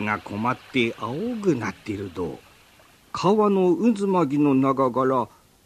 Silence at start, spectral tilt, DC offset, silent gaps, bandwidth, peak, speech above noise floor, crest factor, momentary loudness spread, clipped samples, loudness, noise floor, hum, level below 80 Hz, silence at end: 0 s; -7 dB/octave; under 0.1%; none; 14 kHz; -6 dBFS; 32 dB; 16 dB; 13 LU; under 0.1%; -23 LUFS; -54 dBFS; none; -60 dBFS; 0.4 s